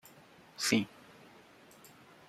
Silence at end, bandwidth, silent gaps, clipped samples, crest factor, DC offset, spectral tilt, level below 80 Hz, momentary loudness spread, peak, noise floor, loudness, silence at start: 1.45 s; 15 kHz; none; under 0.1%; 28 dB; under 0.1%; -3 dB/octave; -74 dBFS; 26 LU; -12 dBFS; -59 dBFS; -33 LUFS; 0.6 s